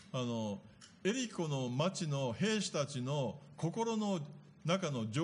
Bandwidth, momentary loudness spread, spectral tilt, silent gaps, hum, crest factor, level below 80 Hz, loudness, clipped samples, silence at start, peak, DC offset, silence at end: 10.5 kHz; 7 LU; -5 dB/octave; none; none; 18 dB; -76 dBFS; -37 LUFS; under 0.1%; 0 s; -20 dBFS; under 0.1%; 0 s